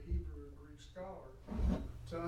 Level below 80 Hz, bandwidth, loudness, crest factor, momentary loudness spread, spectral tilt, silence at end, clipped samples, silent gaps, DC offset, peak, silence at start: -44 dBFS; 9.4 kHz; -43 LUFS; 18 dB; 16 LU; -8 dB/octave; 0 s; under 0.1%; none; under 0.1%; -24 dBFS; 0 s